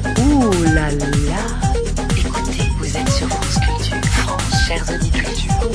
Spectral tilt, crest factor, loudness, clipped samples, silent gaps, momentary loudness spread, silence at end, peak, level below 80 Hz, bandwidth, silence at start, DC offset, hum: -5 dB/octave; 14 dB; -18 LUFS; under 0.1%; none; 6 LU; 0 s; -2 dBFS; -22 dBFS; 11 kHz; 0 s; under 0.1%; none